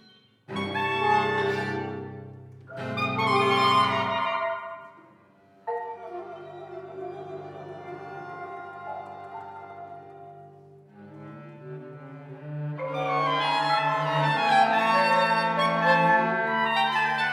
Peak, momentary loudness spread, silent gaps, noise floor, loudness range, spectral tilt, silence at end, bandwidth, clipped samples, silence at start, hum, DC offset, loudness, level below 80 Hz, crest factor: -8 dBFS; 22 LU; none; -57 dBFS; 19 LU; -5 dB/octave; 0 s; 15.5 kHz; under 0.1%; 0.5 s; none; under 0.1%; -24 LUFS; -74 dBFS; 20 dB